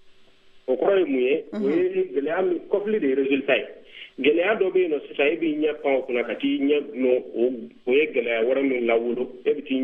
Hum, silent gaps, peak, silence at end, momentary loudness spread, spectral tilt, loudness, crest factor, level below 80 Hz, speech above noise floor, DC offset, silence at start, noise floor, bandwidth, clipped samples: none; none; -6 dBFS; 0 s; 6 LU; -7.5 dB/octave; -23 LUFS; 16 dB; -66 dBFS; 28 dB; under 0.1%; 0.05 s; -51 dBFS; 4.1 kHz; under 0.1%